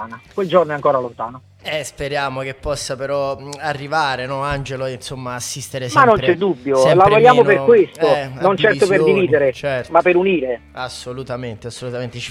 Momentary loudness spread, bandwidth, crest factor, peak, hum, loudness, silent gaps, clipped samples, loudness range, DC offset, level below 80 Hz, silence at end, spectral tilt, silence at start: 16 LU; 15.5 kHz; 16 dB; 0 dBFS; none; -16 LUFS; none; under 0.1%; 9 LU; under 0.1%; -46 dBFS; 0 s; -5 dB/octave; 0 s